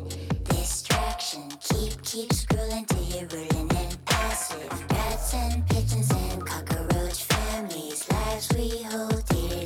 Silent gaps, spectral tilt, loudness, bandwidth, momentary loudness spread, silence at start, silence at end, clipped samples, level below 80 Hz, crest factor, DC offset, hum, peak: none; -4.5 dB/octave; -28 LUFS; 19.5 kHz; 6 LU; 0 s; 0 s; under 0.1%; -34 dBFS; 14 dB; under 0.1%; none; -12 dBFS